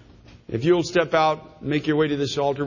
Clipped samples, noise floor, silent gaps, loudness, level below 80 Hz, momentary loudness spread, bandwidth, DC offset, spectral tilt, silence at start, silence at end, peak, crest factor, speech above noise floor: under 0.1%; -46 dBFS; none; -22 LUFS; -52 dBFS; 7 LU; 7.4 kHz; under 0.1%; -6 dB/octave; 0.5 s; 0 s; -6 dBFS; 16 dB; 24 dB